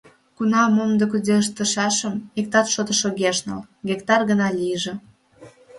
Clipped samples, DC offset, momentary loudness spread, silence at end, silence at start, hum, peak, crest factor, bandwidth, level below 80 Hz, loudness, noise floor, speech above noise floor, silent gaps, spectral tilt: under 0.1%; under 0.1%; 9 LU; 0 s; 0.4 s; none; -2 dBFS; 20 dB; 11.5 kHz; -62 dBFS; -21 LUFS; -48 dBFS; 27 dB; none; -3.5 dB/octave